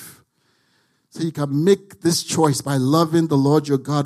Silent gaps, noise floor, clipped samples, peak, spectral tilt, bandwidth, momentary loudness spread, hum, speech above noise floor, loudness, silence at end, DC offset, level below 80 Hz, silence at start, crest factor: none; -64 dBFS; under 0.1%; -4 dBFS; -5.5 dB/octave; 15 kHz; 6 LU; none; 46 dB; -19 LUFS; 0 s; under 0.1%; -62 dBFS; 0 s; 16 dB